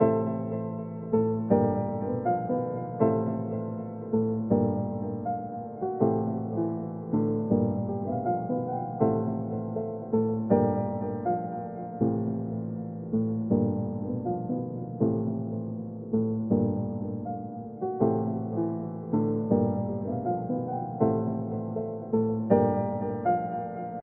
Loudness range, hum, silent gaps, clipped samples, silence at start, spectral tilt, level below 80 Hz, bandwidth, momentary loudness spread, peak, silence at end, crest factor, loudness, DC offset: 2 LU; none; none; under 0.1%; 0 s; -12.5 dB/octave; -62 dBFS; 2.8 kHz; 9 LU; -8 dBFS; 0 s; 20 dB; -29 LUFS; under 0.1%